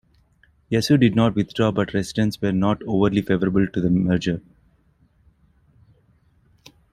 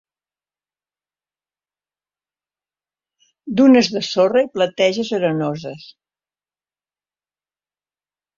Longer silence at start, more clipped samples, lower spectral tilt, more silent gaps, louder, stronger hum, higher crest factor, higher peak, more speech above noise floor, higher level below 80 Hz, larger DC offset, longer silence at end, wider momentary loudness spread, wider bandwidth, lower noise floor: second, 0.7 s vs 3.45 s; neither; first, -7 dB/octave vs -5.5 dB/octave; neither; second, -21 LUFS vs -17 LUFS; second, none vs 50 Hz at -55 dBFS; about the same, 18 dB vs 20 dB; about the same, -4 dBFS vs -2 dBFS; second, 40 dB vs over 73 dB; first, -48 dBFS vs -64 dBFS; neither; about the same, 2.55 s vs 2.6 s; second, 7 LU vs 15 LU; first, 14 kHz vs 7.4 kHz; second, -60 dBFS vs under -90 dBFS